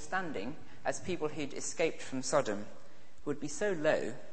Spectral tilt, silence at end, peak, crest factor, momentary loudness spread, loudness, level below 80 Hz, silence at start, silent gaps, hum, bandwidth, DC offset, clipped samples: -4 dB/octave; 0 s; -14 dBFS; 22 dB; 10 LU; -36 LUFS; -66 dBFS; 0 s; none; none; 8.8 kHz; 1%; under 0.1%